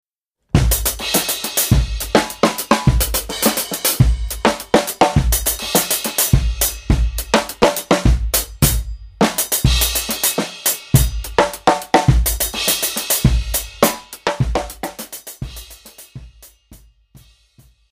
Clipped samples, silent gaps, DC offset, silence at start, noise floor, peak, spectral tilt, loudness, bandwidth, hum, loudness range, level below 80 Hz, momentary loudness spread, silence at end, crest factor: under 0.1%; none; under 0.1%; 0.55 s; -64 dBFS; 0 dBFS; -4 dB/octave; -17 LUFS; 16 kHz; none; 7 LU; -24 dBFS; 9 LU; 1.15 s; 18 dB